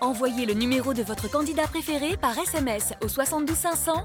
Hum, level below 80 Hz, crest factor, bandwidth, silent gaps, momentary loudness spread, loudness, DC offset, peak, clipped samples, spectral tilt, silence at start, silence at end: none; -44 dBFS; 14 dB; over 20 kHz; none; 3 LU; -26 LUFS; under 0.1%; -12 dBFS; under 0.1%; -3.5 dB/octave; 0 s; 0 s